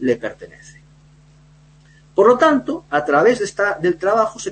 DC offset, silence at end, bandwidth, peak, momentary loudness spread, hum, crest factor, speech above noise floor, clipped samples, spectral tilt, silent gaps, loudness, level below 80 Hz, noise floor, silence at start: under 0.1%; 0 s; 8.8 kHz; -2 dBFS; 11 LU; none; 16 dB; 32 dB; under 0.1%; -5 dB/octave; none; -17 LUFS; -54 dBFS; -49 dBFS; 0 s